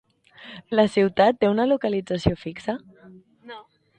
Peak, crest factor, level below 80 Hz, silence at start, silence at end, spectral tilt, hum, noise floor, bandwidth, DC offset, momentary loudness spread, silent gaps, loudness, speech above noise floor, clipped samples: -4 dBFS; 20 dB; -48 dBFS; 0.4 s; 0.4 s; -7 dB/octave; none; -50 dBFS; 9.4 kHz; under 0.1%; 23 LU; none; -22 LUFS; 28 dB; under 0.1%